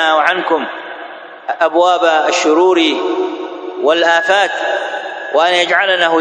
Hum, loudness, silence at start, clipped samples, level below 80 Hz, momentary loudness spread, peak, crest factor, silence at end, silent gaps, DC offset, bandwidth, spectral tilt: none; -13 LUFS; 0 s; under 0.1%; -68 dBFS; 14 LU; 0 dBFS; 14 dB; 0 s; none; under 0.1%; 9.4 kHz; -2 dB/octave